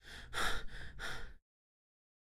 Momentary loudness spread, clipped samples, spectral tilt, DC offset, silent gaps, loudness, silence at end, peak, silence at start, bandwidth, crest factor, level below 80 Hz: 13 LU; under 0.1%; -2 dB/octave; under 0.1%; none; -42 LUFS; 1.05 s; -22 dBFS; 0.05 s; 16 kHz; 20 dB; -50 dBFS